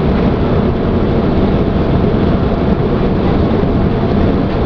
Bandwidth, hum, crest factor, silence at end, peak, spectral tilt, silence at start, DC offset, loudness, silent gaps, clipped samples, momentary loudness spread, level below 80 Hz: 5.4 kHz; none; 12 dB; 0 s; 0 dBFS; -10 dB/octave; 0 s; under 0.1%; -13 LUFS; none; under 0.1%; 1 LU; -20 dBFS